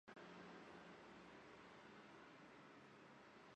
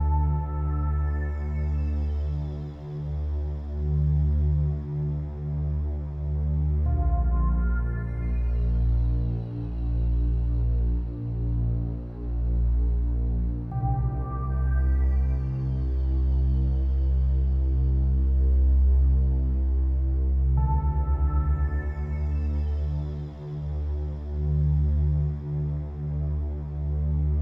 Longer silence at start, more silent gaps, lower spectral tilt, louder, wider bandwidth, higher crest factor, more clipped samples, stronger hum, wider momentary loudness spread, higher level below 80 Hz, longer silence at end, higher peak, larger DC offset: about the same, 0.05 s vs 0 s; neither; second, -5 dB/octave vs -11.5 dB/octave; second, -62 LUFS vs -27 LUFS; first, 9 kHz vs 2.3 kHz; about the same, 16 dB vs 12 dB; neither; neither; second, 4 LU vs 7 LU; second, -88 dBFS vs -26 dBFS; about the same, 0 s vs 0 s; second, -46 dBFS vs -14 dBFS; neither